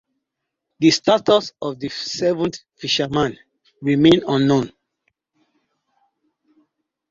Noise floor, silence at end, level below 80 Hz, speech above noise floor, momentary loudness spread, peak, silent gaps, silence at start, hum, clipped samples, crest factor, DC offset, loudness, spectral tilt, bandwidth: -80 dBFS; 2.45 s; -54 dBFS; 62 dB; 13 LU; -2 dBFS; none; 0.8 s; none; under 0.1%; 20 dB; under 0.1%; -19 LUFS; -5 dB/octave; 7.8 kHz